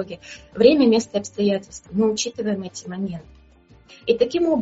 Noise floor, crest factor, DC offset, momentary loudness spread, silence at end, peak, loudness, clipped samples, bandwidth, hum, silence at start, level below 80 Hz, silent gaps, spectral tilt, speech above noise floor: -51 dBFS; 20 dB; under 0.1%; 16 LU; 0 s; -2 dBFS; -21 LUFS; under 0.1%; 8 kHz; none; 0 s; -54 dBFS; none; -5 dB/octave; 31 dB